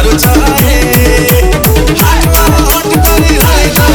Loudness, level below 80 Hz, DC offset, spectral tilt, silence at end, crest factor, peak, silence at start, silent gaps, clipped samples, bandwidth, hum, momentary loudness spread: -7 LUFS; -10 dBFS; under 0.1%; -4.5 dB/octave; 0 s; 6 dB; 0 dBFS; 0 s; none; 2%; over 20 kHz; none; 1 LU